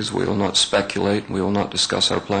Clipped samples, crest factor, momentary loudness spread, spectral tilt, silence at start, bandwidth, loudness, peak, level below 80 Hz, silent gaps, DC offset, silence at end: under 0.1%; 14 dB; 5 LU; -3.5 dB/octave; 0 s; 9.4 kHz; -20 LUFS; -8 dBFS; -50 dBFS; none; under 0.1%; 0 s